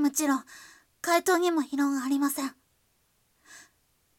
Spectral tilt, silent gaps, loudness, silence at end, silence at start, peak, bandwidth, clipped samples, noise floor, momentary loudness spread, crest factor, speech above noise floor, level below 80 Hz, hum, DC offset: -1.5 dB/octave; none; -27 LUFS; 0.55 s; 0 s; -10 dBFS; 18 kHz; under 0.1%; -70 dBFS; 12 LU; 18 dB; 43 dB; -76 dBFS; none; under 0.1%